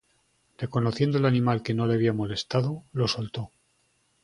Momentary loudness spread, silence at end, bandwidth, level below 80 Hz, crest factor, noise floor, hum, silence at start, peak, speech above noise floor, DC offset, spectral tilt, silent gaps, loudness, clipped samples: 12 LU; 0.75 s; 11 kHz; -58 dBFS; 20 dB; -69 dBFS; none; 0.6 s; -8 dBFS; 44 dB; under 0.1%; -7 dB/octave; none; -26 LUFS; under 0.1%